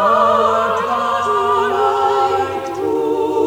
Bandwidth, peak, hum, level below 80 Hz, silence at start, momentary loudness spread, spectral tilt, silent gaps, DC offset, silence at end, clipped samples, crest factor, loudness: 19.5 kHz; -2 dBFS; none; -54 dBFS; 0 s; 6 LU; -4.5 dB/octave; none; under 0.1%; 0 s; under 0.1%; 14 dB; -16 LUFS